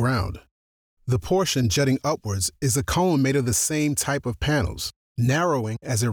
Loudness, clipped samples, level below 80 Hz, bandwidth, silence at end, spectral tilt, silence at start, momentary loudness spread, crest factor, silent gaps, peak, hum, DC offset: -23 LUFS; under 0.1%; -42 dBFS; 19.5 kHz; 0 s; -4.5 dB/octave; 0 s; 7 LU; 12 dB; 0.51-0.97 s, 4.96-5.15 s; -12 dBFS; none; under 0.1%